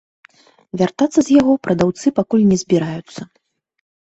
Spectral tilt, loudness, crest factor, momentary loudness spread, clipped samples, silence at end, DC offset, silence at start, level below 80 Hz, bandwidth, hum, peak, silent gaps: -6.5 dB/octave; -16 LUFS; 16 dB; 17 LU; under 0.1%; 0.9 s; under 0.1%; 0.75 s; -52 dBFS; 8.2 kHz; none; -2 dBFS; none